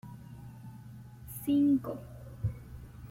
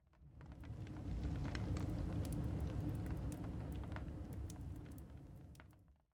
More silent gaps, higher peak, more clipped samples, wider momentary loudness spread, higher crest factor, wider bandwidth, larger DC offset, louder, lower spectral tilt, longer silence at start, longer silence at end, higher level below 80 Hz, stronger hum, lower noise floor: neither; first, -20 dBFS vs -28 dBFS; neither; first, 22 LU vs 15 LU; about the same, 14 dB vs 18 dB; second, 16.5 kHz vs 19 kHz; neither; first, -32 LUFS vs -46 LUFS; about the same, -8 dB/octave vs -7.5 dB/octave; about the same, 0.05 s vs 0.15 s; second, 0.05 s vs 0.2 s; about the same, -54 dBFS vs -50 dBFS; neither; second, -49 dBFS vs -66 dBFS